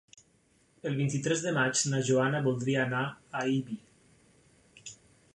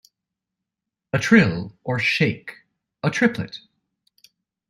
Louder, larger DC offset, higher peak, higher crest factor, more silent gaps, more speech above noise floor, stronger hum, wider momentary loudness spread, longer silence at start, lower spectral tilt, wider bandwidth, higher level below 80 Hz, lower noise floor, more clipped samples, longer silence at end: second, -30 LUFS vs -20 LUFS; neither; second, -16 dBFS vs -2 dBFS; second, 16 dB vs 22 dB; neither; second, 38 dB vs 64 dB; neither; about the same, 18 LU vs 18 LU; second, 0.85 s vs 1.15 s; second, -4.5 dB/octave vs -6 dB/octave; second, 11 kHz vs 12.5 kHz; second, -70 dBFS vs -58 dBFS; second, -67 dBFS vs -85 dBFS; neither; second, 0.4 s vs 1.1 s